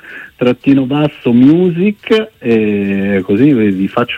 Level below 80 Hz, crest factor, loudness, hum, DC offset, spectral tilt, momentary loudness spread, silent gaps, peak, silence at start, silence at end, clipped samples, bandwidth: -50 dBFS; 12 dB; -12 LUFS; none; under 0.1%; -8.5 dB/octave; 6 LU; none; 0 dBFS; 0.05 s; 0 s; under 0.1%; 7 kHz